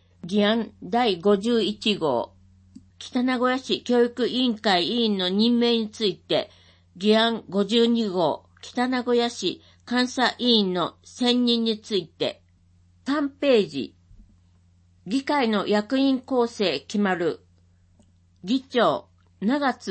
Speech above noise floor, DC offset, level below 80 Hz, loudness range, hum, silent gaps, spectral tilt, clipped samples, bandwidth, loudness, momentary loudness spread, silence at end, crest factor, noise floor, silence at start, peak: 36 dB; under 0.1%; -64 dBFS; 4 LU; none; none; -5 dB/octave; under 0.1%; 8.8 kHz; -23 LUFS; 9 LU; 0 s; 18 dB; -58 dBFS; 0.25 s; -8 dBFS